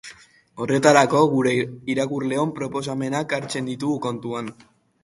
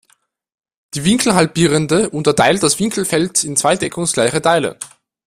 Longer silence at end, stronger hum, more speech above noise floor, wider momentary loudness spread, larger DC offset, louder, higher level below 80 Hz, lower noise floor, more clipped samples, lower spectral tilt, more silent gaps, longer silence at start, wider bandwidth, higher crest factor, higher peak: about the same, 0.5 s vs 0.4 s; neither; second, 26 dB vs 44 dB; first, 14 LU vs 6 LU; neither; second, -22 LUFS vs -15 LUFS; second, -62 dBFS vs -48 dBFS; second, -47 dBFS vs -59 dBFS; neither; about the same, -5 dB/octave vs -4 dB/octave; neither; second, 0.05 s vs 0.95 s; second, 11.5 kHz vs 16 kHz; first, 22 dB vs 16 dB; about the same, 0 dBFS vs 0 dBFS